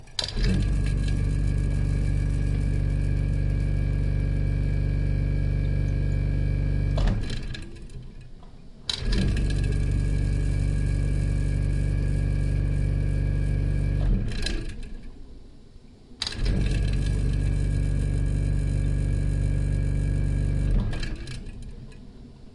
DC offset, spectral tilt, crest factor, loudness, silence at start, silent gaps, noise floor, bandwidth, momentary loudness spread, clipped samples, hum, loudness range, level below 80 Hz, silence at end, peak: under 0.1%; -6.5 dB/octave; 16 dB; -27 LUFS; 0 s; none; -47 dBFS; 11 kHz; 12 LU; under 0.1%; none; 3 LU; -28 dBFS; 0.05 s; -8 dBFS